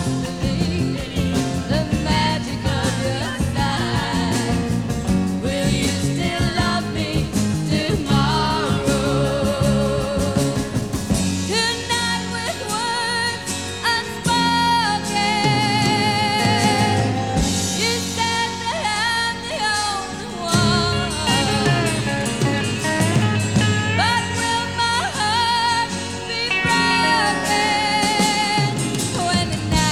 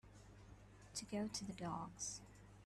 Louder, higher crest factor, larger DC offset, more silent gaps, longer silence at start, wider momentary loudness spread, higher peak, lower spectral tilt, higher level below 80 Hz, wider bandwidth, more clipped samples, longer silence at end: first, -19 LUFS vs -47 LUFS; about the same, 16 dB vs 18 dB; first, 0.4% vs under 0.1%; neither; about the same, 0 s vs 0.05 s; second, 6 LU vs 18 LU; first, -4 dBFS vs -32 dBFS; about the same, -4 dB/octave vs -3.5 dB/octave; first, -36 dBFS vs -68 dBFS; first, 17 kHz vs 13 kHz; neither; about the same, 0 s vs 0 s